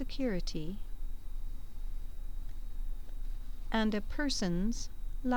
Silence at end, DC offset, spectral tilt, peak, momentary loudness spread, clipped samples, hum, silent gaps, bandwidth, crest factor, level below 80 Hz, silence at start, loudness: 0 s; 1%; -5 dB/octave; -18 dBFS; 15 LU; under 0.1%; none; none; 19 kHz; 14 dB; -38 dBFS; 0 s; -38 LUFS